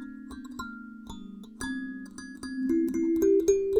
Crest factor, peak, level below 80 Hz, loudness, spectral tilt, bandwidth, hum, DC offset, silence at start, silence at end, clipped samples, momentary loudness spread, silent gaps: 18 dB; -12 dBFS; -54 dBFS; -28 LUFS; -5 dB/octave; 18.5 kHz; none; under 0.1%; 0 s; 0 s; under 0.1%; 20 LU; none